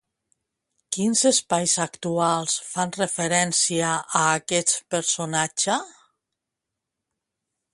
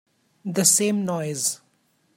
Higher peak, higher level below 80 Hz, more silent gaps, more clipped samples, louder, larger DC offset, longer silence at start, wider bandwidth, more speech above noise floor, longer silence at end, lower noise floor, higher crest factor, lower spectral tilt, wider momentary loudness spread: about the same, -4 dBFS vs -4 dBFS; about the same, -68 dBFS vs -72 dBFS; neither; neither; about the same, -22 LUFS vs -21 LUFS; neither; first, 0.9 s vs 0.45 s; second, 11.5 kHz vs 16.5 kHz; first, 61 dB vs 44 dB; first, 1.85 s vs 0.6 s; first, -84 dBFS vs -66 dBFS; about the same, 20 dB vs 22 dB; about the same, -2.5 dB/octave vs -3 dB/octave; second, 6 LU vs 17 LU